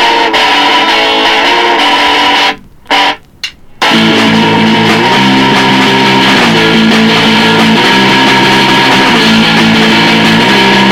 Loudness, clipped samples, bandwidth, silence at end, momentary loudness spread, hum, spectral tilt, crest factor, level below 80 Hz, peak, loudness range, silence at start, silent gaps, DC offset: -5 LUFS; 1%; 16.5 kHz; 0 s; 3 LU; none; -4 dB/octave; 6 dB; -40 dBFS; 0 dBFS; 3 LU; 0 s; none; under 0.1%